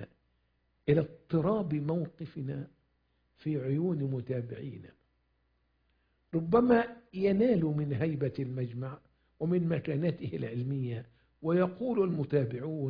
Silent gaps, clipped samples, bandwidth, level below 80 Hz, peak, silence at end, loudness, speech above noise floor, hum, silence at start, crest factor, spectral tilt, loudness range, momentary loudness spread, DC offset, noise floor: none; under 0.1%; 5.2 kHz; -64 dBFS; -12 dBFS; 0 s; -32 LUFS; 44 dB; none; 0 s; 20 dB; -11.5 dB/octave; 7 LU; 14 LU; under 0.1%; -75 dBFS